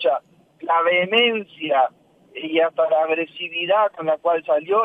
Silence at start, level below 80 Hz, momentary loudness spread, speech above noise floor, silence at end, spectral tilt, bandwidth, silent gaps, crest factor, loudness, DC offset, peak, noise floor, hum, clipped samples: 0 s; -78 dBFS; 10 LU; 21 dB; 0 s; -6 dB/octave; 4.7 kHz; none; 16 dB; -20 LUFS; under 0.1%; -4 dBFS; -41 dBFS; none; under 0.1%